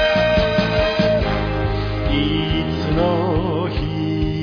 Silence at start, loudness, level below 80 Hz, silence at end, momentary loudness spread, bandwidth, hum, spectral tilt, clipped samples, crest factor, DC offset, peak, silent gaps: 0 s; -19 LUFS; -28 dBFS; 0 s; 6 LU; 5.4 kHz; none; -7.5 dB/octave; under 0.1%; 14 dB; under 0.1%; -4 dBFS; none